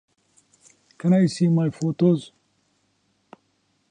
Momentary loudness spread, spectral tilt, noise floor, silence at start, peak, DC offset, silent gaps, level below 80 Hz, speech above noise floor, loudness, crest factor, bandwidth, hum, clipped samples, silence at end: 7 LU; -8 dB/octave; -68 dBFS; 1.05 s; -8 dBFS; under 0.1%; none; -68 dBFS; 49 dB; -21 LUFS; 16 dB; 10 kHz; none; under 0.1%; 1.65 s